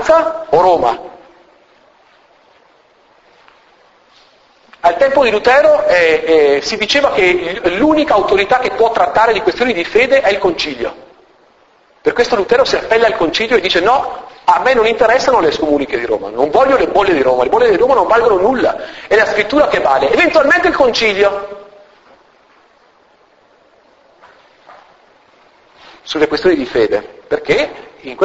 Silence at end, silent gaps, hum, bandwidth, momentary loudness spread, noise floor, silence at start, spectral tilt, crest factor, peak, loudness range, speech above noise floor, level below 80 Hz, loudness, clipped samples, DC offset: 0 s; none; none; 8 kHz; 7 LU; -50 dBFS; 0 s; -4 dB/octave; 14 dB; 0 dBFS; 7 LU; 39 dB; -44 dBFS; -12 LUFS; under 0.1%; under 0.1%